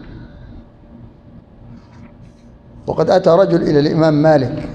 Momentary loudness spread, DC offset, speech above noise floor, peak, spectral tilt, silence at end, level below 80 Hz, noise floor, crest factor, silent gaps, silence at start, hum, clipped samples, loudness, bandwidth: 18 LU; under 0.1%; 29 dB; 0 dBFS; -8 dB/octave; 0 s; -44 dBFS; -42 dBFS; 16 dB; none; 0 s; none; under 0.1%; -13 LUFS; 8.4 kHz